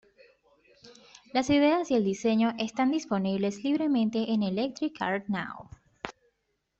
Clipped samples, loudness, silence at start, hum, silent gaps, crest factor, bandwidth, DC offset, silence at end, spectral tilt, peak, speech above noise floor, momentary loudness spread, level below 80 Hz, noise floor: under 0.1%; -28 LUFS; 0.85 s; none; none; 18 dB; 8 kHz; under 0.1%; 0.7 s; -5.5 dB/octave; -12 dBFS; 51 dB; 16 LU; -64 dBFS; -78 dBFS